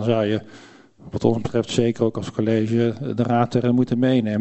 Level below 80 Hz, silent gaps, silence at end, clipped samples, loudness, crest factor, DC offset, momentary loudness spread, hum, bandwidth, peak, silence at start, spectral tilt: -54 dBFS; none; 0 s; under 0.1%; -21 LUFS; 18 dB; under 0.1%; 5 LU; none; 8.4 kHz; -4 dBFS; 0 s; -7 dB/octave